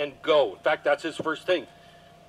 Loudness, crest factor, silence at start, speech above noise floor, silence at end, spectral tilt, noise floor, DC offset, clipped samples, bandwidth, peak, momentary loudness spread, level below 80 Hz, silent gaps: -25 LUFS; 16 dB; 0 s; 26 dB; 0.65 s; -4 dB/octave; -52 dBFS; under 0.1%; under 0.1%; 11.5 kHz; -10 dBFS; 7 LU; -68 dBFS; none